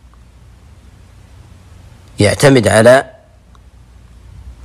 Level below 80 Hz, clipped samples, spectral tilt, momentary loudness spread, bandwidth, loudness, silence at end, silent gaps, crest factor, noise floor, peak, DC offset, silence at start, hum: -42 dBFS; under 0.1%; -5 dB/octave; 7 LU; 15 kHz; -10 LUFS; 0.1 s; none; 16 dB; -43 dBFS; 0 dBFS; under 0.1%; 2.2 s; none